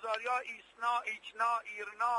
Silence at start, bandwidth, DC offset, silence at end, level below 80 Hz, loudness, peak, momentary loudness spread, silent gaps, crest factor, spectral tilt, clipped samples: 0 s; 11.5 kHz; under 0.1%; 0 s; -80 dBFS; -35 LUFS; -18 dBFS; 8 LU; none; 18 dB; 0 dB/octave; under 0.1%